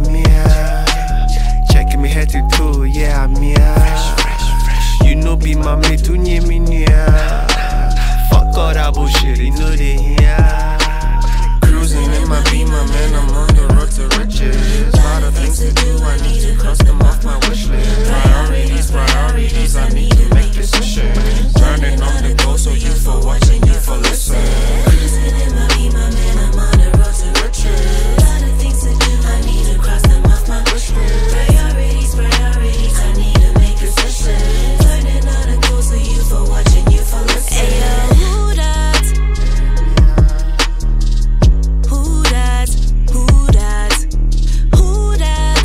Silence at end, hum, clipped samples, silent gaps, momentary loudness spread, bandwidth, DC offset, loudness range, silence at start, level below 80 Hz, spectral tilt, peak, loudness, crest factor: 0 s; none; under 0.1%; none; 5 LU; 15 kHz; under 0.1%; 1 LU; 0 s; -10 dBFS; -5 dB/octave; 0 dBFS; -14 LUFS; 10 dB